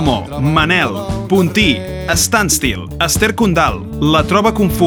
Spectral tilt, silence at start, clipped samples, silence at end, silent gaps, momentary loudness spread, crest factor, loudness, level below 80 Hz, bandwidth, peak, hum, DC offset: -4 dB/octave; 0 s; under 0.1%; 0 s; none; 6 LU; 14 dB; -14 LUFS; -28 dBFS; over 20 kHz; 0 dBFS; none; under 0.1%